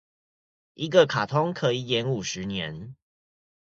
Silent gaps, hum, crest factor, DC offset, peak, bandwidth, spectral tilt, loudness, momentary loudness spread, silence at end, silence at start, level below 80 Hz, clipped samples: none; none; 22 dB; under 0.1%; -4 dBFS; 7.8 kHz; -5 dB/octave; -25 LUFS; 14 LU; 0.7 s; 0.8 s; -60 dBFS; under 0.1%